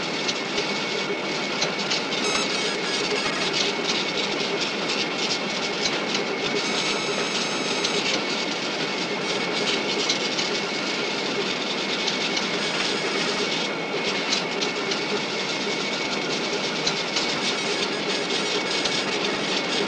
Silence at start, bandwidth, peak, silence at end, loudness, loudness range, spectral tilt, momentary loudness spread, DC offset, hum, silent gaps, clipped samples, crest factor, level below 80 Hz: 0 s; 11.5 kHz; -10 dBFS; 0 s; -24 LUFS; 1 LU; -2 dB/octave; 3 LU; under 0.1%; none; none; under 0.1%; 16 dB; -64 dBFS